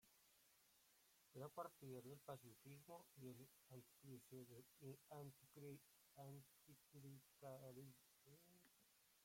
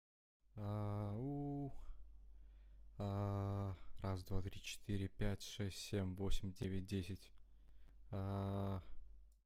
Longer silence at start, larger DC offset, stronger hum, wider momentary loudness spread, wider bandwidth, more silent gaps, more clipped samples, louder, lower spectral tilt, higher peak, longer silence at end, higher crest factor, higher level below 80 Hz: second, 0 s vs 0.55 s; neither; neither; second, 8 LU vs 20 LU; about the same, 16.5 kHz vs 15.5 kHz; neither; neither; second, -62 LUFS vs -46 LUFS; about the same, -5.5 dB/octave vs -6.5 dB/octave; second, -40 dBFS vs -26 dBFS; second, 0 s vs 0.15 s; first, 24 dB vs 18 dB; second, under -90 dBFS vs -52 dBFS